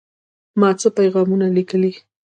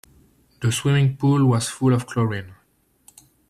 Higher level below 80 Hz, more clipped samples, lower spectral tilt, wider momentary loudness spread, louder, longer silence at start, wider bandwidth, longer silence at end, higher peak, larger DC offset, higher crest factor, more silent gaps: second, -66 dBFS vs -56 dBFS; neither; about the same, -6.5 dB/octave vs -6 dB/octave; about the same, 5 LU vs 7 LU; first, -17 LUFS vs -21 LUFS; about the same, 0.55 s vs 0.6 s; second, 9.8 kHz vs 13 kHz; second, 0.3 s vs 0.95 s; first, -2 dBFS vs -8 dBFS; neither; about the same, 16 dB vs 14 dB; neither